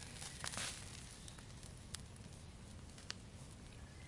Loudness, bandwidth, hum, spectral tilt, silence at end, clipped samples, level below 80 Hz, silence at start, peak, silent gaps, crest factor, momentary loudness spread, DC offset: -50 LUFS; 11.5 kHz; none; -2.5 dB/octave; 0 s; under 0.1%; -62 dBFS; 0 s; -20 dBFS; none; 30 dB; 12 LU; under 0.1%